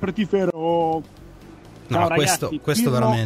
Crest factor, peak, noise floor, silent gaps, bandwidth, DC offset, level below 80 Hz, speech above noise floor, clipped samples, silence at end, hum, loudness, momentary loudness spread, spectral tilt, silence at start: 16 dB; -6 dBFS; -43 dBFS; none; 16 kHz; under 0.1%; -50 dBFS; 22 dB; under 0.1%; 0 s; none; -21 LUFS; 5 LU; -5 dB/octave; 0 s